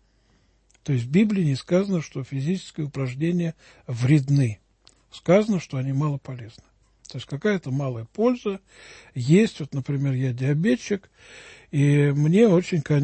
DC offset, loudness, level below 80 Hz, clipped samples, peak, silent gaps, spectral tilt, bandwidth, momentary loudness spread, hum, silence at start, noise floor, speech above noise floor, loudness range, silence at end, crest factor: under 0.1%; -23 LUFS; -58 dBFS; under 0.1%; -6 dBFS; none; -7.5 dB/octave; 8.8 kHz; 16 LU; none; 0.85 s; -62 dBFS; 39 dB; 4 LU; 0 s; 18 dB